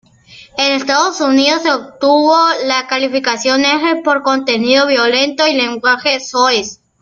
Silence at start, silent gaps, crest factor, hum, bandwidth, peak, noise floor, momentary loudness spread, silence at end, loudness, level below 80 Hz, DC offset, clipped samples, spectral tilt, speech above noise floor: 0.3 s; none; 14 dB; none; 7.6 kHz; 0 dBFS; -41 dBFS; 5 LU; 0.3 s; -12 LUFS; -58 dBFS; under 0.1%; under 0.1%; -2 dB/octave; 28 dB